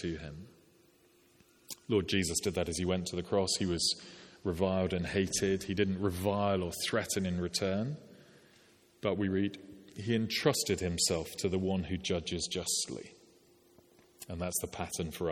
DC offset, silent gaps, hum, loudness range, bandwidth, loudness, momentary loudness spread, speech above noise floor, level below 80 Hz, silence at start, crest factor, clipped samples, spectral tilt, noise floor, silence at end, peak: under 0.1%; none; none; 4 LU; 18.5 kHz; -33 LUFS; 13 LU; 32 dB; -58 dBFS; 0 s; 20 dB; under 0.1%; -4 dB/octave; -65 dBFS; 0 s; -14 dBFS